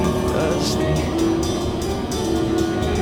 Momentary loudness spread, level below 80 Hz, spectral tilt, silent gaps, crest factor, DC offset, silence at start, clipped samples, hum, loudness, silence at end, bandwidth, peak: 3 LU; -32 dBFS; -5.5 dB/octave; none; 14 dB; under 0.1%; 0 s; under 0.1%; none; -21 LUFS; 0 s; 19.5 kHz; -8 dBFS